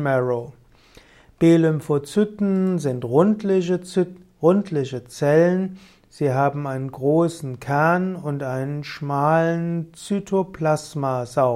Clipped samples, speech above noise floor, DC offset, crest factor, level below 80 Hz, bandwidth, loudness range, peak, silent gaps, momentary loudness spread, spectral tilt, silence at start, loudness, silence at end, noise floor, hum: under 0.1%; 30 dB; under 0.1%; 18 dB; -58 dBFS; 14 kHz; 2 LU; -4 dBFS; none; 10 LU; -7.5 dB/octave; 0 s; -21 LUFS; 0 s; -51 dBFS; none